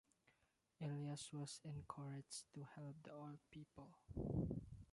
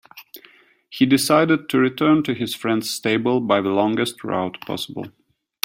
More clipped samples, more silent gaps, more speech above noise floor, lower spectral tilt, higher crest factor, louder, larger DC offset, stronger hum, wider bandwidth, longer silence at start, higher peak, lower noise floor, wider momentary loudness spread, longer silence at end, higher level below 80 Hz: neither; neither; about the same, 32 dB vs 33 dB; about the same, -6 dB/octave vs -5 dB/octave; about the same, 20 dB vs 20 dB; second, -52 LUFS vs -20 LUFS; neither; neither; second, 11.5 kHz vs 16.5 kHz; first, 0.8 s vs 0.15 s; second, -32 dBFS vs 0 dBFS; first, -83 dBFS vs -52 dBFS; about the same, 14 LU vs 15 LU; second, 0.1 s vs 0.55 s; about the same, -66 dBFS vs -62 dBFS